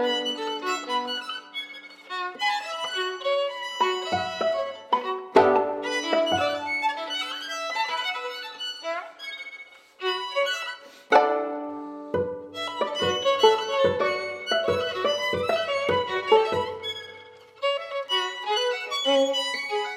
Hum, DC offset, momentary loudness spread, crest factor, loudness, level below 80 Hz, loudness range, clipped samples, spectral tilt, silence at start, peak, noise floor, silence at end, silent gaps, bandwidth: none; under 0.1%; 12 LU; 22 dB; -26 LUFS; -68 dBFS; 5 LU; under 0.1%; -3 dB/octave; 0 s; -4 dBFS; -47 dBFS; 0 s; none; 16 kHz